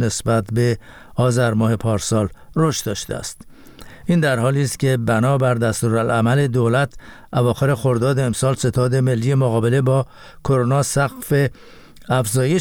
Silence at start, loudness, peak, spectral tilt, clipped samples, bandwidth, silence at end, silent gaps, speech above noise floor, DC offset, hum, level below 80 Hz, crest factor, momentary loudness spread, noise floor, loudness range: 0 s; -19 LUFS; -4 dBFS; -6 dB/octave; under 0.1%; 18 kHz; 0 s; none; 22 dB; under 0.1%; none; -44 dBFS; 14 dB; 7 LU; -40 dBFS; 3 LU